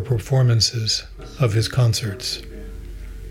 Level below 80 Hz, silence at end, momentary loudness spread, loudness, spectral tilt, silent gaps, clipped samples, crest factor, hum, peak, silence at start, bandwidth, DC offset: -38 dBFS; 0 s; 20 LU; -20 LUFS; -4.5 dB/octave; none; under 0.1%; 16 dB; none; -6 dBFS; 0 s; 15.5 kHz; under 0.1%